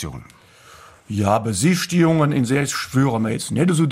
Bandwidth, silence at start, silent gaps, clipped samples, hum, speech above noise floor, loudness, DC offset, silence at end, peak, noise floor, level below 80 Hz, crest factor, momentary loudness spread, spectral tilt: 16 kHz; 0 s; none; under 0.1%; none; 28 dB; -19 LUFS; under 0.1%; 0 s; -4 dBFS; -47 dBFS; -50 dBFS; 16 dB; 7 LU; -5.5 dB/octave